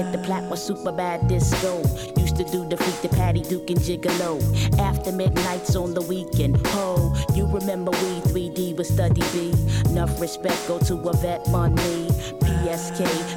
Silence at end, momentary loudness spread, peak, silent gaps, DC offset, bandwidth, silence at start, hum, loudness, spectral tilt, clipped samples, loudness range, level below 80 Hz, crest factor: 0 s; 5 LU; -10 dBFS; none; under 0.1%; 19 kHz; 0 s; none; -23 LUFS; -6 dB/octave; under 0.1%; 1 LU; -32 dBFS; 12 dB